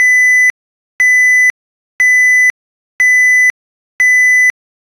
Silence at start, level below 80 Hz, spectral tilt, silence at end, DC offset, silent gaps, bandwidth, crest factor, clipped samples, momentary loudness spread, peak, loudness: 0 s; -64 dBFS; 2.5 dB/octave; 0.5 s; under 0.1%; 0.50-0.99 s, 1.50-1.99 s, 2.50-2.99 s, 3.50-3.99 s; 14.5 kHz; 8 dB; under 0.1%; 6 LU; -2 dBFS; -8 LUFS